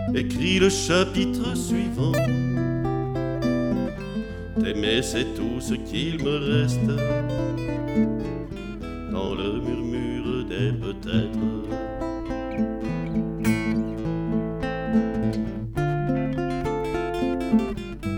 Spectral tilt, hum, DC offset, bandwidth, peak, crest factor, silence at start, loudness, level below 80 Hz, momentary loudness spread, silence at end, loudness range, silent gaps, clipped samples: -6 dB/octave; none; under 0.1%; 17.5 kHz; -6 dBFS; 18 dB; 0 s; -25 LUFS; -40 dBFS; 7 LU; 0 s; 3 LU; none; under 0.1%